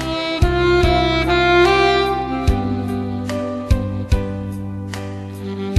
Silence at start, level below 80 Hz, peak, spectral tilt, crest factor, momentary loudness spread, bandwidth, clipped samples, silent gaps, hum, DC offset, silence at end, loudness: 0 s; -26 dBFS; -2 dBFS; -6 dB/octave; 16 dB; 14 LU; 13 kHz; under 0.1%; none; none; under 0.1%; 0 s; -18 LUFS